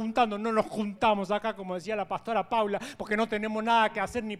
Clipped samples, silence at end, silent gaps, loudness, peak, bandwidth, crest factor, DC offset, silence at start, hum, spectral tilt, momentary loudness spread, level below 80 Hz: under 0.1%; 0 s; none; -29 LUFS; -10 dBFS; 14 kHz; 18 dB; under 0.1%; 0 s; none; -5 dB/octave; 8 LU; -60 dBFS